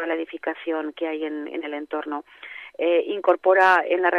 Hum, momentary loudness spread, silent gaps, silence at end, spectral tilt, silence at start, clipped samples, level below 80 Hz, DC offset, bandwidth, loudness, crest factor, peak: none; 16 LU; none; 0 s; -4 dB/octave; 0 s; under 0.1%; -76 dBFS; under 0.1%; 10 kHz; -23 LUFS; 18 dB; -6 dBFS